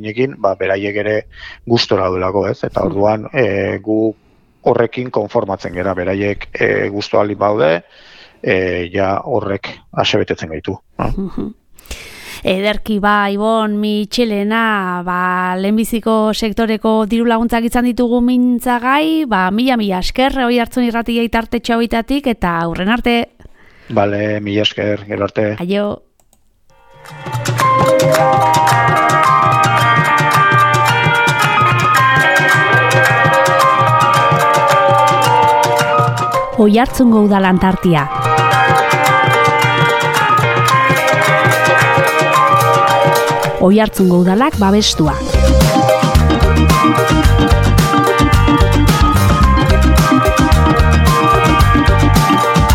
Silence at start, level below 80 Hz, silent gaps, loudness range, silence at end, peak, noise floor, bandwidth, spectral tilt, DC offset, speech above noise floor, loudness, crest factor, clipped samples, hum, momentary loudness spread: 0 s; -24 dBFS; none; 8 LU; 0 s; 0 dBFS; -53 dBFS; 17.5 kHz; -5.5 dB/octave; under 0.1%; 39 dB; -12 LUFS; 12 dB; under 0.1%; none; 8 LU